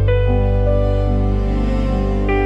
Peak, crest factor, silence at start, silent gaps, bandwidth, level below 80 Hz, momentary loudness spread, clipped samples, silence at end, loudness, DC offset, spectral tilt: -4 dBFS; 10 dB; 0 s; none; 5.4 kHz; -18 dBFS; 3 LU; under 0.1%; 0 s; -18 LUFS; under 0.1%; -9 dB/octave